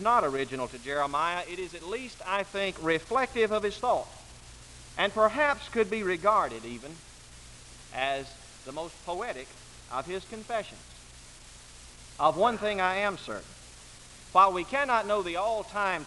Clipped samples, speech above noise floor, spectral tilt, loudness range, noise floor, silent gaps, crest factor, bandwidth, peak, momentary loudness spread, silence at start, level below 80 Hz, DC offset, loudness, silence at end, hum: under 0.1%; 21 dB; -3.5 dB/octave; 9 LU; -50 dBFS; none; 22 dB; 11.5 kHz; -8 dBFS; 23 LU; 0 s; -56 dBFS; under 0.1%; -29 LUFS; 0 s; 60 Hz at -60 dBFS